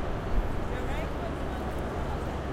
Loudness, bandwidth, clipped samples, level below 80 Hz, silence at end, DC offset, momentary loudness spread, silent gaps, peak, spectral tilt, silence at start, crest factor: -33 LUFS; 15.5 kHz; under 0.1%; -34 dBFS; 0 s; under 0.1%; 1 LU; none; -16 dBFS; -7 dB/octave; 0 s; 14 dB